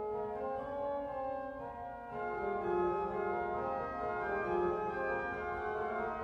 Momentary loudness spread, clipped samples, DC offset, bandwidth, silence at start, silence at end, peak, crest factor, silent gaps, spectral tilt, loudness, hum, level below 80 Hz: 8 LU; under 0.1%; under 0.1%; 6.8 kHz; 0 s; 0 s; -22 dBFS; 14 dB; none; -8 dB/octave; -37 LUFS; none; -60 dBFS